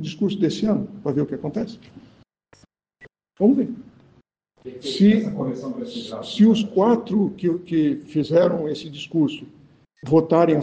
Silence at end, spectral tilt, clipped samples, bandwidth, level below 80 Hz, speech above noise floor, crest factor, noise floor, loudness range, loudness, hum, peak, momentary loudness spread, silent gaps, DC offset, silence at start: 0 s; -7.5 dB/octave; under 0.1%; 8.6 kHz; -60 dBFS; 39 dB; 18 dB; -59 dBFS; 7 LU; -21 LUFS; none; -4 dBFS; 14 LU; none; under 0.1%; 0 s